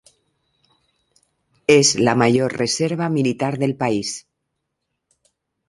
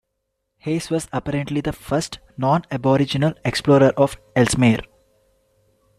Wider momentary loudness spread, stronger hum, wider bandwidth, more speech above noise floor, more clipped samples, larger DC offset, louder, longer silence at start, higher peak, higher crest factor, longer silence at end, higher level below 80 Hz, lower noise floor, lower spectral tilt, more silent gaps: about the same, 10 LU vs 10 LU; neither; second, 11.5 kHz vs 14.5 kHz; about the same, 59 dB vs 56 dB; neither; neither; about the same, -18 LUFS vs -20 LUFS; first, 1.7 s vs 0.65 s; about the same, -2 dBFS vs -4 dBFS; about the same, 20 dB vs 18 dB; first, 1.5 s vs 1.15 s; second, -58 dBFS vs -46 dBFS; about the same, -77 dBFS vs -76 dBFS; second, -4 dB/octave vs -6 dB/octave; neither